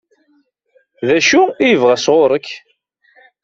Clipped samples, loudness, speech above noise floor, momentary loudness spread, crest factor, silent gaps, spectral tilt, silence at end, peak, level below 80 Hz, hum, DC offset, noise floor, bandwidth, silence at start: under 0.1%; -13 LUFS; 47 dB; 13 LU; 14 dB; none; -3.5 dB/octave; 0.85 s; 0 dBFS; -58 dBFS; none; under 0.1%; -59 dBFS; 7.8 kHz; 1 s